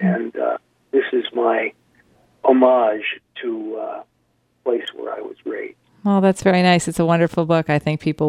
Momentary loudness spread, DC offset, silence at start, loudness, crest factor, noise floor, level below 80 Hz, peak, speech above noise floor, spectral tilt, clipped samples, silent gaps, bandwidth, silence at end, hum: 15 LU; under 0.1%; 0 s; -19 LUFS; 18 dB; -65 dBFS; -56 dBFS; -2 dBFS; 46 dB; -6 dB/octave; under 0.1%; none; 13 kHz; 0 s; none